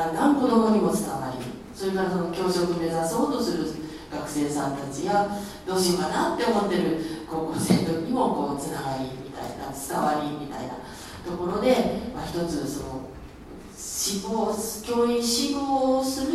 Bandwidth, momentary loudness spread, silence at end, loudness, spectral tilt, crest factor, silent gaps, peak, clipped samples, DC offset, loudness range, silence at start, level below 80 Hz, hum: 15 kHz; 13 LU; 0 s; -26 LUFS; -4.5 dB/octave; 20 dB; none; -6 dBFS; under 0.1%; under 0.1%; 4 LU; 0 s; -50 dBFS; none